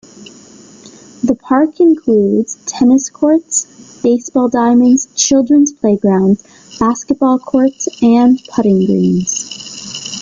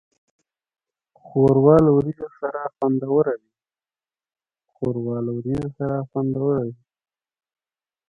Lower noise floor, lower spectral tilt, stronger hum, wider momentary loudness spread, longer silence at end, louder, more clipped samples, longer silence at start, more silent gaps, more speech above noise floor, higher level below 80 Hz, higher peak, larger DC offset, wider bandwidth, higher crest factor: second, -39 dBFS vs under -90 dBFS; second, -5 dB/octave vs -11 dB/octave; neither; second, 9 LU vs 14 LU; second, 0 s vs 1.35 s; first, -12 LUFS vs -21 LUFS; neither; second, 0.2 s vs 1.25 s; neither; second, 27 dB vs over 70 dB; about the same, -50 dBFS vs -52 dBFS; about the same, 0 dBFS vs -2 dBFS; neither; first, 9.6 kHz vs 5.2 kHz; second, 12 dB vs 22 dB